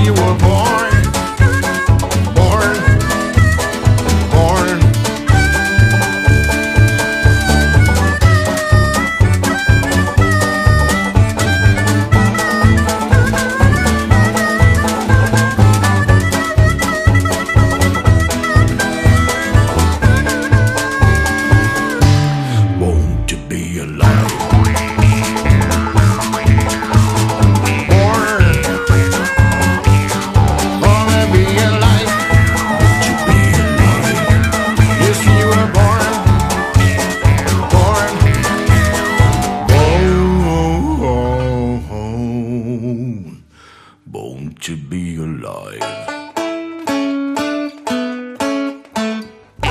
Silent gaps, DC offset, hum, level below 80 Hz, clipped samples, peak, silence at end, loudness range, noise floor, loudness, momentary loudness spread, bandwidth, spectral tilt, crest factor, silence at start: none; under 0.1%; none; -22 dBFS; under 0.1%; 0 dBFS; 0 s; 9 LU; -43 dBFS; -13 LUFS; 10 LU; 15.5 kHz; -5.5 dB/octave; 12 dB; 0 s